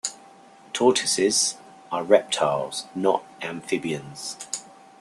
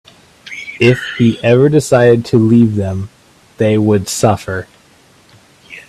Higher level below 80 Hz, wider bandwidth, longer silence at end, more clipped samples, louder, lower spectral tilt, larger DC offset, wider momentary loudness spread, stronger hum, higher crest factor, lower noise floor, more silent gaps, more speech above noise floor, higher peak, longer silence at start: second, -70 dBFS vs -48 dBFS; second, 13 kHz vs 14.5 kHz; first, 0.35 s vs 0.1 s; neither; second, -24 LUFS vs -12 LUFS; second, -2.5 dB/octave vs -6.5 dB/octave; neither; about the same, 14 LU vs 15 LU; neither; first, 22 dB vs 14 dB; about the same, -50 dBFS vs -47 dBFS; neither; second, 26 dB vs 36 dB; second, -4 dBFS vs 0 dBFS; second, 0.05 s vs 0.45 s